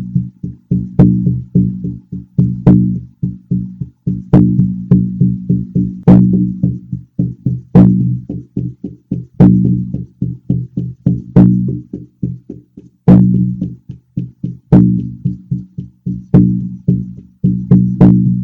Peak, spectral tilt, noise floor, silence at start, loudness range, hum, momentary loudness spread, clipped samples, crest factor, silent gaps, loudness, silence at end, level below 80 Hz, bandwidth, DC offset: 0 dBFS; -12.5 dB/octave; -40 dBFS; 0 s; 3 LU; none; 16 LU; 0.6%; 12 dB; none; -13 LUFS; 0 s; -32 dBFS; 2.7 kHz; under 0.1%